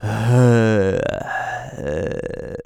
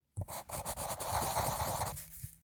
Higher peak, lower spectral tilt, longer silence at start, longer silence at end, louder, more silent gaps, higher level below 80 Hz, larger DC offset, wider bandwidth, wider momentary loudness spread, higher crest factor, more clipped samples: first, -4 dBFS vs -22 dBFS; first, -7.5 dB/octave vs -3.5 dB/octave; second, 0 s vs 0.15 s; about the same, 0.05 s vs 0.05 s; first, -19 LUFS vs -38 LUFS; neither; first, -44 dBFS vs -52 dBFS; neither; second, 11.5 kHz vs over 20 kHz; first, 13 LU vs 9 LU; about the same, 16 dB vs 18 dB; neither